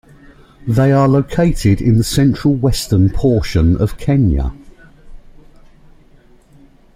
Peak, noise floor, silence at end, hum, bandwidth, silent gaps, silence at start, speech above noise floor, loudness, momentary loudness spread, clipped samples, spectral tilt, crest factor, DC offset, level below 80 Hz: -2 dBFS; -46 dBFS; 1.75 s; none; 16 kHz; none; 0.65 s; 33 dB; -14 LUFS; 4 LU; under 0.1%; -7 dB/octave; 14 dB; under 0.1%; -28 dBFS